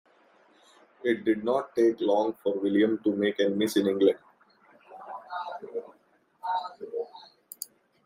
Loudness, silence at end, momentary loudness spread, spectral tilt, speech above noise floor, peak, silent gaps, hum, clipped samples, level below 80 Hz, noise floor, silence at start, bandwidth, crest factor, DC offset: -28 LUFS; 0.4 s; 16 LU; -5.5 dB/octave; 40 dB; -10 dBFS; none; none; under 0.1%; -78 dBFS; -65 dBFS; 1.05 s; 16 kHz; 20 dB; under 0.1%